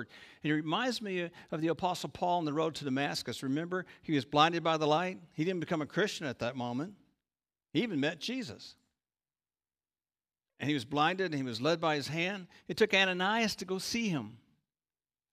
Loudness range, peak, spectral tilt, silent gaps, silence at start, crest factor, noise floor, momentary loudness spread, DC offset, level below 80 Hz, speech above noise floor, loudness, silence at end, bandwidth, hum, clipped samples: 8 LU; -12 dBFS; -4.5 dB/octave; none; 0 s; 22 dB; under -90 dBFS; 12 LU; under 0.1%; -72 dBFS; over 57 dB; -33 LUFS; 0.95 s; 15.5 kHz; none; under 0.1%